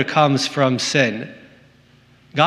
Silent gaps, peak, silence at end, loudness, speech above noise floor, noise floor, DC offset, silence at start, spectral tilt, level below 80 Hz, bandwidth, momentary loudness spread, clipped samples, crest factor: none; -2 dBFS; 0 s; -18 LUFS; 34 dB; -52 dBFS; under 0.1%; 0 s; -4.5 dB/octave; -66 dBFS; 13 kHz; 14 LU; under 0.1%; 18 dB